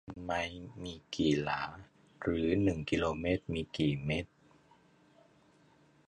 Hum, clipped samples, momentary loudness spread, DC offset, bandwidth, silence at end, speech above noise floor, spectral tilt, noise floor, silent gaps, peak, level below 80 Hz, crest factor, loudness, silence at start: none; under 0.1%; 14 LU; under 0.1%; 10.5 kHz; 1.8 s; 32 dB; -6 dB/octave; -65 dBFS; none; -16 dBFS; -54 dBFS; 20 dB; -34 LUFS; 0.05 s